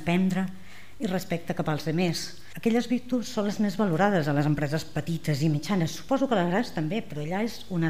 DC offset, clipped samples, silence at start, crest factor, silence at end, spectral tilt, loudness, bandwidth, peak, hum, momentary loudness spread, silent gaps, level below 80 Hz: 1%; under 0.1%; 0 s; 16 dB; 0 s; -6 dB/octave; -27 LUFS; 15.5 kHz; -10 dBFS; none; 7 LU; none; -56 dBFS